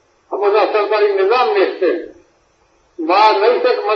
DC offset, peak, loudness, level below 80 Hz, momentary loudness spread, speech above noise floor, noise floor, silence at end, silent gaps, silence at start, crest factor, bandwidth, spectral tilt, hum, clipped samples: under 0.1%; 0 dBFS; -14 LUFS; -66 dBFS; 9 LU; 42 dB; -56 dBFS; 0 s; none; 0.3 s; 16 dB; 6.6 kHz; -3.5 dB/octave; none; under 0.1%